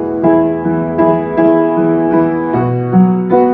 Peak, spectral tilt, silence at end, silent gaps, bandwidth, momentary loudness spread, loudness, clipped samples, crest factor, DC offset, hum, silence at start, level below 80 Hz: 0 dBFS; -12.5 dB/octave; 0 s; none; 3.8 kHz; 4 LU; -12 LUFS; under 0.1%; 10 dB; under 0.1%; none; 0 s; -46 dBFS